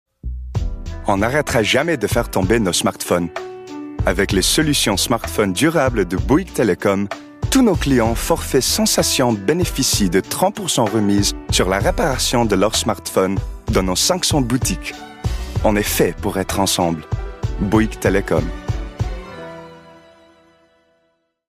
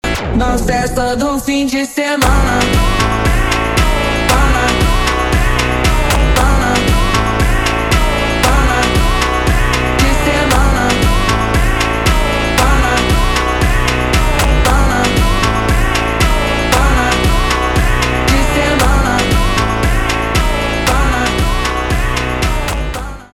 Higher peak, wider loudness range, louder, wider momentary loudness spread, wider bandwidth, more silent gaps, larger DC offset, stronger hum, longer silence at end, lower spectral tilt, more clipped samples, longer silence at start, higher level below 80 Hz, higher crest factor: about the same, -2 dBFS vs 0 dBFS; first, 4 LU vs 1 LU; second, -18 LUFS vs -13 LUFS; first, 12 LU vs 4 LU; second, 15.5 kHz vs 17.5 kHz; neither; neither; neither; first, 1.55 s vs 0.1 s; about the same, -4 dB/octave vs -4.5 dB/octave; neither; first, 0.25 s vs 0.05 s; second, -30 dBFS vs -16 dBFS; about the same, 16 dB vs 12 dB